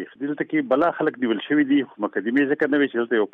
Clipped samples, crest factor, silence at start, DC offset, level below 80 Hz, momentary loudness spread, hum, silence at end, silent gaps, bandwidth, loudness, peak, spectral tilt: under 0.1%; 14 dB; 0 s; under 0.1%; -68 dBFS; 7 LU; none; 0.05 s; none; 4 kHz; -22 LUFS; -8 dBFS; -8 dB/octave